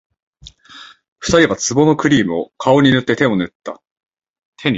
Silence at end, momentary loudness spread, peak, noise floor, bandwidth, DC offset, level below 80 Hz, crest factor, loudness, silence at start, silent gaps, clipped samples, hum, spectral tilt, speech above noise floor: 0 s; 14 LU; 0 dBFS; -41 dBFS; 8 kHz; under 0.1%; -46 dBFS; 16 dB; -15 LUFS; 0.45 s; 1.08-1.16 s, 3.55-3.60 s, 3.91-3.96 s, 4.29-4.34 s, 4.45-4.53 s; under 0.1%; none; -5 dB/octave; 27 dB